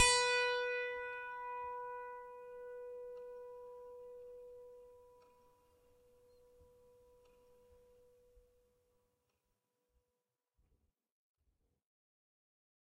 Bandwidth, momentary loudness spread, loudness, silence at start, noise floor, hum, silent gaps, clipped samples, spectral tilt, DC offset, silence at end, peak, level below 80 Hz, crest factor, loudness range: 14 kHz; 22 LU; -39 LUFS; 0 s; under -90 dBFS; none; none; under 0.1%; 1.5 dB/octave; under 0.1%; 4.45 s; -16 dBFS; -70 dBFS; 28 dB; 27 LU